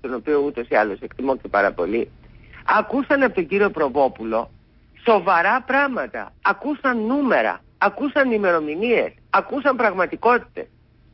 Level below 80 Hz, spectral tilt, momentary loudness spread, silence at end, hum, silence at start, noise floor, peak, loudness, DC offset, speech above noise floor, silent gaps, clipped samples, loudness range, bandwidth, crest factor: -52 dBFS; -10 dB/octave; 8 LU; 0.5 s; none; 0.05 s; -50 dBFS; -6 dBFS; -20 LUFS; under 0.1%; 30 dB; none; under 0.1%; 2 LU; 5.8 kHz; 14 dB